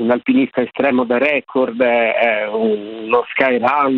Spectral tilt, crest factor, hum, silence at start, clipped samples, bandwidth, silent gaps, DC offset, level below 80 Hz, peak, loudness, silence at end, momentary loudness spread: -7.5 dB/octave; 16 dB; none; 0 s; under 0.1%; 5 kHz; none; under 0.1%; -62 dBFS; 0 dBFS; -16 LUFS; 0 s; 5 LU